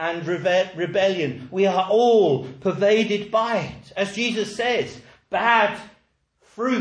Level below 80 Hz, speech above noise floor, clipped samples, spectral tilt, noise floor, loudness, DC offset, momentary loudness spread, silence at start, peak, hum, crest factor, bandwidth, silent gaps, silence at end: -62 dBFS; 43 dB; under 0.1%; -5 dB/octave; -64 dBFS; -21 LUFS; under 0.1%; 10 LU; 0 s; -4 dBFS; none; 18 dB; 10.5 kHz; none; 0 s